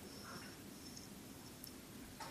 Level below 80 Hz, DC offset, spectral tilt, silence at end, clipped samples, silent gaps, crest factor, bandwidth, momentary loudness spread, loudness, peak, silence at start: -70 dBFS; under 0.1%; -3.5 dB/octave; 0 s; under 0.1%; none; 24 dB; 15.5 kHz; 3 LU; -53 LUFS; -30 dBFS; 0 s